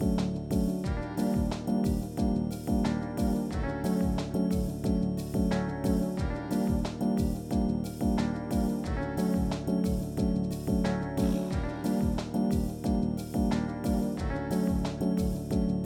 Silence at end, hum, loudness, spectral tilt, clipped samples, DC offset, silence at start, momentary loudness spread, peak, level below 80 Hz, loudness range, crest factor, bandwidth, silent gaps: 0 s; none; -30 LUFS; -7.5 dB/octave; under 0.1%; under 0.1%; 0 s; 2 LU; -16 dBFS; -38 dBFS; 0 LU; 14 dB; 17 kHz; none